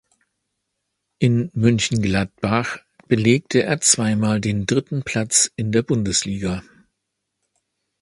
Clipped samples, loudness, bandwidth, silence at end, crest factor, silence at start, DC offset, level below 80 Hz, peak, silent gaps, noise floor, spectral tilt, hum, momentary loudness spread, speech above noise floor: under 0.1%; -19 LUFS; 11.5 kHz; 1.4 s; 22 dB; 1.2 s; under 0.1%; -46 dBFS; 0 dBFS; none; -78 dBFS; -4 dB/octave; none; 8 LU; 59 dB